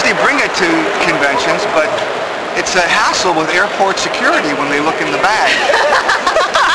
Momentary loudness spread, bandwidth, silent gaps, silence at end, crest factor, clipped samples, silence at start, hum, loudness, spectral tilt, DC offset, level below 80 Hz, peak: 4 LU; 11 kHz; none; 0 s; 10 dB; under 0.1%; 0 s; none; -12 LUFS; -2.5 dB/octave; 0.2%; -46 dBFS; -2 dBFS